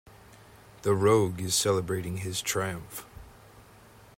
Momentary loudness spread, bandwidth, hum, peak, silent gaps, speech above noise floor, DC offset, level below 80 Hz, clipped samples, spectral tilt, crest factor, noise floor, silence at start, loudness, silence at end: 17 LU; 16.5 kHz; none; -10 dBFS; none; 26 dB; under 0.1%; -58 dBFS; under 0.1%; -4 dB/octave; 20 dB; -54 dBFS; 0.3 s; -27 LUFS; 0.55 s